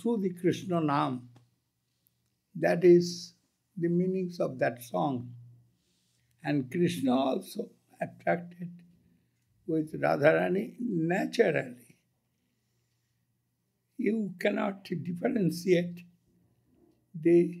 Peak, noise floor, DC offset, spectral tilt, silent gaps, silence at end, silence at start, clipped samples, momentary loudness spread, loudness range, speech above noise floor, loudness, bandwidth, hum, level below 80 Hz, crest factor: -8 dBFS; -78 dBFS; under 0.1%; -7 dB/octave; none; 0 s; 0 s; under 0.1%; 17 LU; 5 LU; 50 dB; -29 LUFS; 15 kHz; none; -78 dBFS; 22 dB